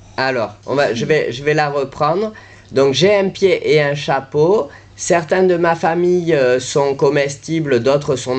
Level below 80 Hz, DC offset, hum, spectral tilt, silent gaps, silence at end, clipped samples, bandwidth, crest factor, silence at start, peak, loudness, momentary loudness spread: -52 dBFS; under 0.1%; none; -5 dB/octave; none; 0 s; under 0.1%; 9 kHz; 12 dB; 0.2 s; -2 dBFS; -16 LUFS; 6 LU